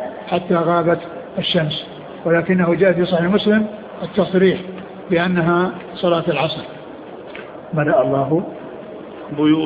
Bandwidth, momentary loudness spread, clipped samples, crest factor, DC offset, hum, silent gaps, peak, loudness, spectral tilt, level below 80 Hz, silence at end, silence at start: 5 kHz; 18 LU; under 0.1%; 16 dB; under 0.1%; none; none; -2 dBFS; -18 LUFS; -9.5 dB/octave; -54 dBFS; 0 s; 0 s